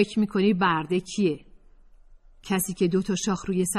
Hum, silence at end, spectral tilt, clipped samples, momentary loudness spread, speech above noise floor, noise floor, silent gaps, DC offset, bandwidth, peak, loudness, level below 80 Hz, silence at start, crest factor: none; 0 s; -5 dB/octave; under 0.1%; 6 LU; 28 dB; -52 dBFS; none; under 0.1%; 13.5 kHz; -8 dBFS; -25 LUFS; -52 dBFS; 0 s; 16 dB